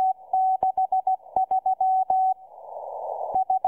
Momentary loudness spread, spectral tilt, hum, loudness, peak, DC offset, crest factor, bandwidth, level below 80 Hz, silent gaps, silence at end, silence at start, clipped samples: 12 LU; -7.5 dB/octave; none; -24 LUFS; -10 dBFS; under 0.1%; 14 dB; 1.3 kHz; -66 dBFS; none; 0 s; 0 s; under 0.1%